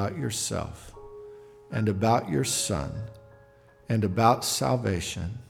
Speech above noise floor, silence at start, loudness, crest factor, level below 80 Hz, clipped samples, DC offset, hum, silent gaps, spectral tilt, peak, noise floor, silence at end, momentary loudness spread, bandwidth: 29 dB; 0 s; -27 LUFS; 20 dB; -50 dBFS; under 0.1%; under 0.1%; none; none; -4.5 dB/octave; -8 dBFS; -56 dBFS; 0.05 s; 22 LU; 17.5 kHz